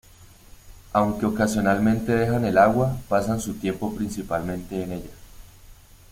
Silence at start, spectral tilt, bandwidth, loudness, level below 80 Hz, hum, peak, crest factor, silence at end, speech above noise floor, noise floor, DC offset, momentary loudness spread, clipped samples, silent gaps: 0.2 s; -6.5 dB/octave; 16.5 kHz; -23 LUFS; -44 dBFS; none; -4 dBFS; 20 dB; 0.4 s; 26 dB; -49 dBFS; under 0.1%; 12 LU; under 0.1%; none